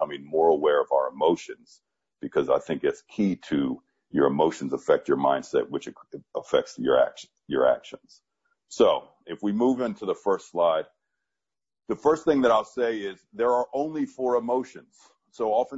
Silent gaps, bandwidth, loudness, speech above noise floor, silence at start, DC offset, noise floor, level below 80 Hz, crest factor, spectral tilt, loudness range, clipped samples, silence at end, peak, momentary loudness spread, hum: none; 8 kHz; -25 LUFS; over 65 dB; 0 s; under 0.1%; under -90 dBFS; -64 dBFS; 18 dB; -6 dB/octave; 2 LU; under 0.1%; 0 s; -8 dBFS; 14 LU; none